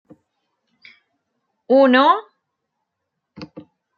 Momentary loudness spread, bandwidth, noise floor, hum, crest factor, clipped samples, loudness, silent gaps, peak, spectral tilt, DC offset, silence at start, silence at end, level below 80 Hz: 26 LU; 6.6 kHz; -78 dBFS; none; 20 dB; under 0.1%; -15 LUFS; none; -2 dBFS; -6 dB/octave; under 0.1%; 1.7 s; 0.35 s; -72 dBFS